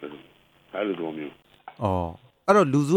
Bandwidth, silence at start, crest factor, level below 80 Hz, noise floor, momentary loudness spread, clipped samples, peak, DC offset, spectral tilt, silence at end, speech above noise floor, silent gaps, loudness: 14.5 kHz; 0 s; 20 dB; -56 dBFS; -57 dBFS; 18 LU; under 0.1%; -6 dBFS; under 0.1%; -7 dB/octave; 0 s; 34 dB; none; -25 LUFS